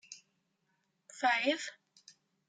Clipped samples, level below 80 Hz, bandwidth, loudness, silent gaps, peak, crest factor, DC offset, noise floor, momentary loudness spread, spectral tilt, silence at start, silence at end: under 0.1%; under -90 dBFS; 9.6 kHz; -33 LUFS; none; -18 dBFS; 20 dB; under 0.1%; -79 dBFS; 23 LU; -1 dB/octave; 0.1 s; 0.75 s